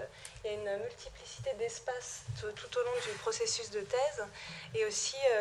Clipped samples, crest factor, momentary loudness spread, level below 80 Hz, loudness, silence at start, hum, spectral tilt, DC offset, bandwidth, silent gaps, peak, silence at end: under 0.1%; 20 dB; 11 LU; -62 dBFS; -37 LUFS; 0 s; none; -2 dB/octave; under 0.1%; 12.5 kHz; none; -18 dBFS; 0 s